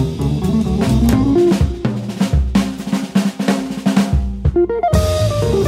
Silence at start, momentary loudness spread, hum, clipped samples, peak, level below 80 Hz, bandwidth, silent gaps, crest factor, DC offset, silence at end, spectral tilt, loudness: 0 s; 5 LU; none; under 0.1%; -2 dBFS; -24 dBFS; 16 kHz; none; 14 dB; under 0.1%; 0 s; -7 dB/octave; -16 LUFS